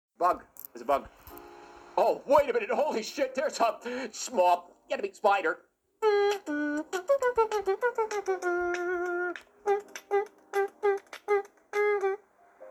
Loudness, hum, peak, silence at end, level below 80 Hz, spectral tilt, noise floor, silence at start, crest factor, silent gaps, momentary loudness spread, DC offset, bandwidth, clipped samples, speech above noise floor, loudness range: -29 LUFS; none; -10 dBFS; 0 s; -66 dBFS; -3 dB/octave; -55 dBFS; 0.2 s; 20 dB; none; 10 LU; under 0.1%; 19 kHz; under 0.1%; 27 dB; 3 LU